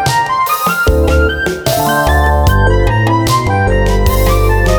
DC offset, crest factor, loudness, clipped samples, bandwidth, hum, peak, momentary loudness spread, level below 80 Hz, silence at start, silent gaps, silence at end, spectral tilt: under 0.1%; 10 dB; -12 LUFS; under 0.1%; over 20 kHz; none; 0 dBFS; 2 LU; -16 dBFS; 0 s; none; 0 s; -5.5 dB/octave